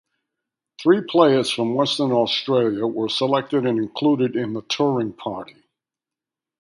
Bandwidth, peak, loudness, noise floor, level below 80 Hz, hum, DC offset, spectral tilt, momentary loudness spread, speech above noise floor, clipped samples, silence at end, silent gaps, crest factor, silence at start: 11.5 kHz; 0 dBFS; -20 LUFS; -89 dBFS; -66 dBFS; none; under 0.1%; -5.5 dB/octave; 9 LU; 69 dB; under 0.1%; 1.15 s; none; 20 dB; 0.8 s